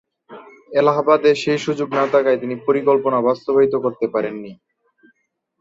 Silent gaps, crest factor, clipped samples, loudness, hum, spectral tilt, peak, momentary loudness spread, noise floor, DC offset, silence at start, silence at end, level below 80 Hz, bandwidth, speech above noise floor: none; 16 dB; under 0.1%; -18 LUFS; none; -6 dB/octave; -2 dBFS; 8 LU; -68 dBFS; under 0.1%; 0.3 s; 1.05 s; -66 dBFS; 7.8 kHz; 50 dB